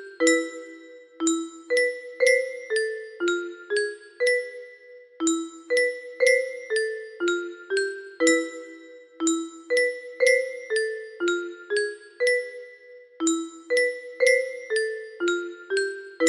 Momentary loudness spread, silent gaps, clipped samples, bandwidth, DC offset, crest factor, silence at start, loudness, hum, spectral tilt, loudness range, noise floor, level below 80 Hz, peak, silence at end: 11 LU; none; under 0.1%; 12.5 kHz; under 0.1%; 20 dB; 0 s; -25 LUFS; none; -0.5 dB/octave; 2 LU; -48 dBFS; -76 dBFS; -6 dBFS; 0 s